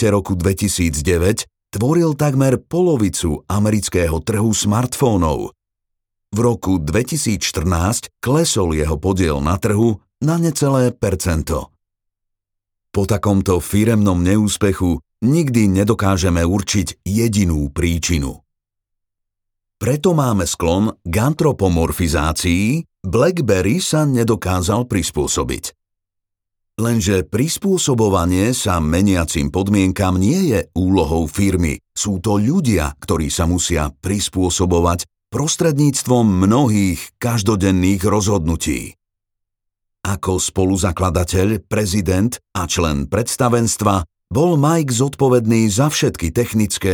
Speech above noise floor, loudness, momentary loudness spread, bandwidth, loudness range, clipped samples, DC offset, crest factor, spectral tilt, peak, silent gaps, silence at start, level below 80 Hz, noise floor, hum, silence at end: 63 dB; -17 LUFS; 6 LU; 19.5 kHz; 4 LU; under 0.1%; under 0.1%; 16 dB; -5.5 dB/octave; -2 dBFS; none; 0 s; -32 dBFS; -79 dBFS; none; 0 s